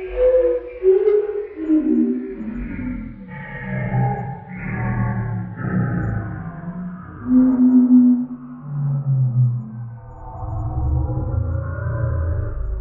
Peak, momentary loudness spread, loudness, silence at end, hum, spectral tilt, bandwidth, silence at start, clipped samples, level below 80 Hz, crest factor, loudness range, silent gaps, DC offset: -4 dBFS; 17 LU; -20 LUFS; 0 s; none; -13 dB/octave; 3.2 kHz; 0 s; under 0.1%; -34 dBFS; 14 dB; 8 LU; none; under 0.1%